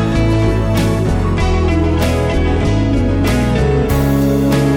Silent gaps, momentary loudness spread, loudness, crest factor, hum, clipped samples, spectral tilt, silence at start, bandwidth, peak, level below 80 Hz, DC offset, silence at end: none; 2 LU; -14 LUFS; 10 dB; none; under 0.1%; -7 dB/octave; 0 s; 17.5 kHz; -4 dBFS; -20 dBFS; under 0.1%; 0 s